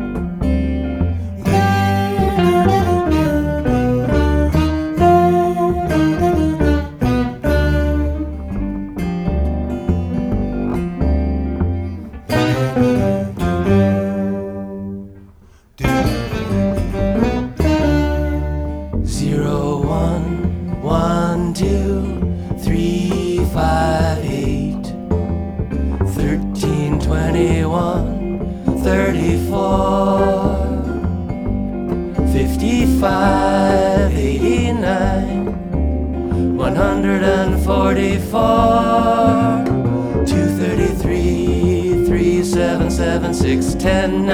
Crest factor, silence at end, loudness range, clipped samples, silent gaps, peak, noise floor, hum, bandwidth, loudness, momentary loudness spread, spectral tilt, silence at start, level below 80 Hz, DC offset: 16 dB; 0 s; 4 LU; under 0.1%; none; 0 dBFS; -45 dBFS; none; 16 kHz; -17 LUFS; 8 LU; -7 dB/octave; 0 s; -24 dBFS; under 0.1%